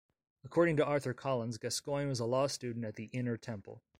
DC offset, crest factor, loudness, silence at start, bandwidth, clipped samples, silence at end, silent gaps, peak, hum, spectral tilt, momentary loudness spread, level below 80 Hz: under 0.1%; 18 dB; -35 LUFS; 0.45 s; 16 kHz; under 0.1%; 0.2 s; none; -16 dBFS; none; -5.5 dB/octave; 11 LU; -68 dBFS